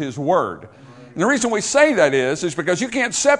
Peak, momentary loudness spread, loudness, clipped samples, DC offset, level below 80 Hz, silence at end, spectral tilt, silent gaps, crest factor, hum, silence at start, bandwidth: 0 dBFS; 9 LU; -18 LUFS; under 0.1%; under 0.1%; -58 dBFS; 0 s; -3.5 dB/octave; none; 18 dB; none; 0 s; 11 kHz